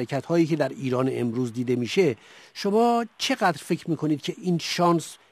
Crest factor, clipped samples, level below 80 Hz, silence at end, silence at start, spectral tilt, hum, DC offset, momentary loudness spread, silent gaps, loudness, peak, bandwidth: 16 dB; under 0.1%; -70 dBFS; 0.15 s; 0 s; -5.5 dB/octave; none; under 0.1%; 6 LU; none; -25 LUFS; -8 dBFS; 14 kHz